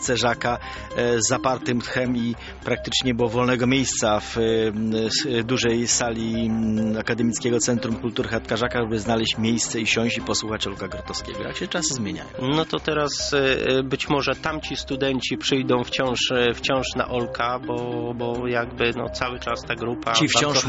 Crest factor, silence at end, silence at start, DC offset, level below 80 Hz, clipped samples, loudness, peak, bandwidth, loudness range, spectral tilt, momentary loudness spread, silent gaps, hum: 22 dB; 0 s; 0 s; under 0.1%; -44 dBFS; under 0.1%; -23 LUFS; -2 dBFS; 8.2 kHz; 3 LU; -3.5 dB/octave; 7 LU; none; none